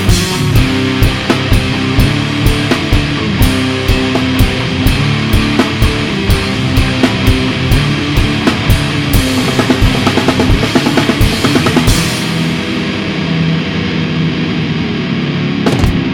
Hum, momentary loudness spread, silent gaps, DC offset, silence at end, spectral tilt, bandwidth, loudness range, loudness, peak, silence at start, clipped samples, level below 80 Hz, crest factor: none; 4 LU; none; under 0.1%; 0 s; -5.5 dB/octave; over 20 kHz; 3 LU; -12 LUFS; 0 dBFS; 0 s; 0.2%; -20 dBFS; 12 dB